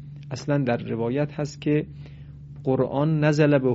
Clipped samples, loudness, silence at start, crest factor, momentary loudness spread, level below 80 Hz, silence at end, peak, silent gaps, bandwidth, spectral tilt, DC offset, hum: under 0.1%; -24 LUFS; 0 s; 18 dB; 21 LU; -54 dBFS; 0 s; -6 dBFS; none; 7.8 kHz; -7 dB/octave; under 0.1%; none